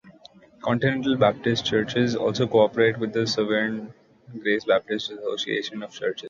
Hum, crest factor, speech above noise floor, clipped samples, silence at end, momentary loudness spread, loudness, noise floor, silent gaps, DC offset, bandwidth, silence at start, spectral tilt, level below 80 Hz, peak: none; 18 dB; 28 dB; under 0.1%; 0 s; 10 LU; -24 LUFS; -51 dBFS; none; under 0.1%; 7.6 kHz; 0.05 s; -5.5 dB/octave; -60 dBFS; -6 dBFS